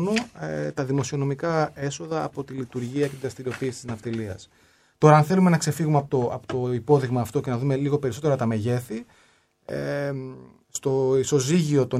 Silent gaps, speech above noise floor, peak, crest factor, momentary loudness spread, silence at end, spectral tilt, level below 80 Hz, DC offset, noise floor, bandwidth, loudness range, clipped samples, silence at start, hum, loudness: none; 37 dB; -2 dBFS; 22 dB; 12 LU; 0 s; -6.5 dB/octave; -60 dBFS; under 0.1%; -61 dBFS; 15 kHz; 7 LU; under 0.1%; 0 s; none; -24 LUFS